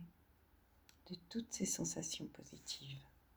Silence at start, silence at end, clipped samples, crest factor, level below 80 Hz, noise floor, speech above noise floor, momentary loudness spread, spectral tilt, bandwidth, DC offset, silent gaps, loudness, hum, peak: 0 s; 0.15 s; under 0.1%; 22 dB; -72 dBFS; -71 dBFS; 25 dB; 15 LU; -3 dB/octave; over 20 kHz; under 0.1%; none; -45 LUFS; none; -26 dBFS